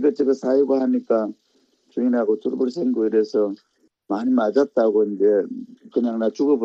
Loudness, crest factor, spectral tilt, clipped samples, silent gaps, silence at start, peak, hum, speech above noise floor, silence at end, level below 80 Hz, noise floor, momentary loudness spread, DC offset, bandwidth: -21 LUFS; 14 dB; -7.5 dB/octave; under 0.1%; none; 0 s; -6 dBFS; none; 42 dB; 0 s; -72 dBFS; -62 dBFS; 9 LU; under 0.1%; 7.6 kHz